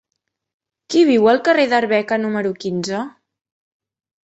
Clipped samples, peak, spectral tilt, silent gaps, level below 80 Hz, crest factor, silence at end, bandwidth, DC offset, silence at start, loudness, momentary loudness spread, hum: under 0.1%; -2 dBFS; -5 dB/octave; none; -64 dBFS; 18 dB; 1.15 s; 8.2 kHz; under 0.1%; 0.9 s; -17 LUFS; 11 LU; none